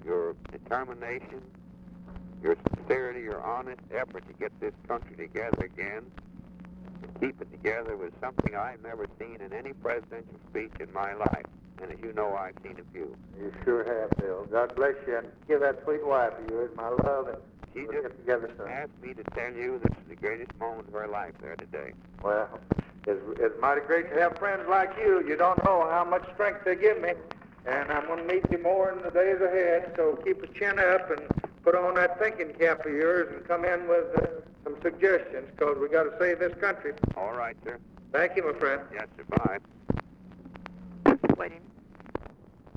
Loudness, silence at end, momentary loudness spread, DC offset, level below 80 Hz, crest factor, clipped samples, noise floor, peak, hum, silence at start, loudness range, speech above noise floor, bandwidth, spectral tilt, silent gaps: -29 LUFS; 0.1 s; 17 LU; under 0.1%; -52 dBFS; 20 dB; under 0.1%; -51 dBFS; -10 dBFS; none; 0 s; 9 LU; 22 dB; 6.8 kHz; -8.5 dB/octave; none